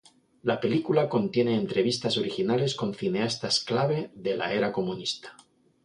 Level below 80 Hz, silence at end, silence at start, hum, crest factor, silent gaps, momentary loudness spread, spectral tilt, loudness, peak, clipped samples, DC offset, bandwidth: -66 dBFS; 0.5 s; 0.45 s; none; 18 dB; none; 7 LU; -5 dB/octave; -27 LUFS; -10 dBFS; under 0.1%; under 0.1%; 11 kHz